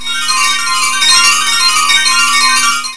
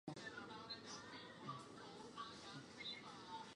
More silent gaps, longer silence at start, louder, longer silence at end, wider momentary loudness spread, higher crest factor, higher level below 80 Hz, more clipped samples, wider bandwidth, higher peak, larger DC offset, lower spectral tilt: neither; about the same, 0 s vs 0.05 s; first, -8 LUFS vs -53 LUFS; about the same, 0 s vs 0 s; about the same, 5 LU vs 5 LU; second, 12 dB vs 18 dB; first, -56 dBFS vs -82 dBFS; neither; about the same, 11 kHz vs 11 kHz; first, 0 dBFS vs -36 dBFS; first, 7% vs under 0.1%; second, 2.5 dB/octave vs -3.5 dB/octave